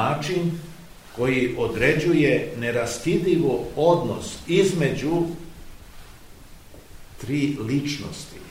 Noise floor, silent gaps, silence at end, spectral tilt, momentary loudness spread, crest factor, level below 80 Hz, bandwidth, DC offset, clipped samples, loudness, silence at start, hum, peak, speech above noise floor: -44 dBFS; none; 0 s; -6 dB/octave; 16 LU; 20 dB; -46 dBFS; 16 kHz; 0.3%; under 0.1%; -23 LUFS; 0 s; none; -4 dBFS; 22 dB